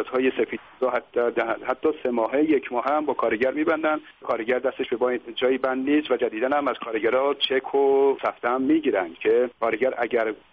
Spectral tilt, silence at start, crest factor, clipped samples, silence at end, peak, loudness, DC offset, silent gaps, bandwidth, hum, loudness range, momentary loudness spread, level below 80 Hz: -2 dB/octave; 0 s; 14 dB; under 0.1%; 0.15 s; -10 dBFS; -24 LUFS; under 0.1%; none; 5.2 kHz; none; 2 LU; 5 LU; -64 dBFS